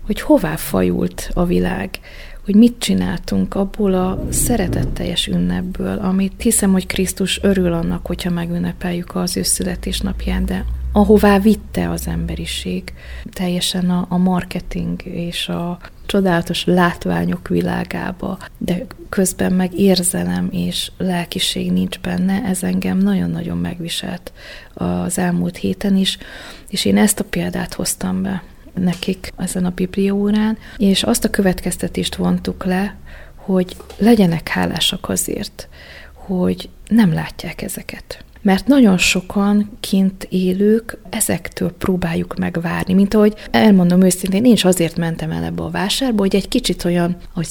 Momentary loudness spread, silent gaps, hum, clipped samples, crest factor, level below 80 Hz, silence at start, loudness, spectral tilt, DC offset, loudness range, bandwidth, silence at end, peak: 11 LU; none; none; under 0.1%; 16 dB; -32 dBFS; 0 s; -18 LUFS; -5 dB/octave; under 0.1%; 5 LU; 19 kHz; 0 s; 0 dBFS